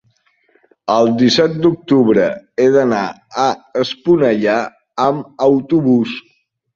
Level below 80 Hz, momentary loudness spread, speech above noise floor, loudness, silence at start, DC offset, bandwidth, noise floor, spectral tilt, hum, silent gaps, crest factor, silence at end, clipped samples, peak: -56 dBFS; 8 LU; 45 dB; -15 LUFS; 0.85 s; under 0.1%; 7.4 kHz; -59 dBFS; -6 dB/octave; none; none; 14 dB; 0.55 s; under 0.1%; 0 dBFS